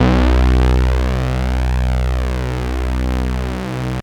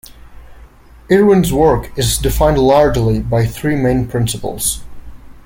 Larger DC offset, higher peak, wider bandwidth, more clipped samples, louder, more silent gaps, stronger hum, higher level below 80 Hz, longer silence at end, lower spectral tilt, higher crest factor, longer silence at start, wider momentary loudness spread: neither; second, -4 dBFS vs 0 dBFS; second, 10.5 kHz vs 17 kHz; neither; second, -18 LUFS vs -14 LUFS; neither; neither; first, -18 dBFS vs -28 dBFS; about the same, 0 s vs 0.1 s; first, -7 dB/octave vs -5.5 dB/octave; about the same, 12 dB vs 14 dB; about the same, 0 s vs 0.1 s; about the same, 8 LU vs 8 LU